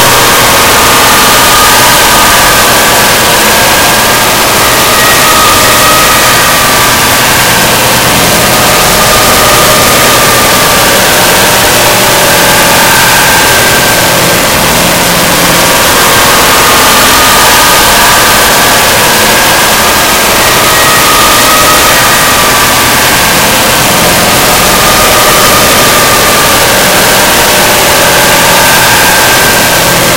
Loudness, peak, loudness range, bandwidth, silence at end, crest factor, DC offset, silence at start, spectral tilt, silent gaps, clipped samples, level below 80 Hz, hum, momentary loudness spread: -2 LUFS; 0 dBFS; 1 LU; over 20 kHz; 0 s; 4 dB; 1%; 0 s; -1.5 dB/octave; none; 10%; -24 dBFS; none; 2 LU